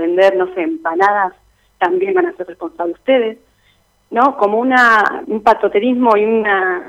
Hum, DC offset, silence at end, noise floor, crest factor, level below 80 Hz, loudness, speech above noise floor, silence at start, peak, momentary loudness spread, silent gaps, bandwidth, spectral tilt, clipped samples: none; under 0.1%; 0 s; -56 dBFS; 14 dB; -56 dBFS; -14 LUFS; 42 dB; 0 s; 0 dBFS; 11 LU; none; 11.5 kHz; -5.5 dB/octave; under 0.1%